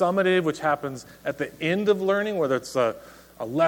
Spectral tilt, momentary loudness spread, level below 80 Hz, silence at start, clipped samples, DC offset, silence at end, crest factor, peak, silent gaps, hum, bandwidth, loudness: -5.5 dB/octave; 12 LU; -62 dBFS; 0 s; under 0.1%; under 0.1%; 0 s; 16 dB; -8 dBFS; none; none; 18.5 kHz; -25 LUFS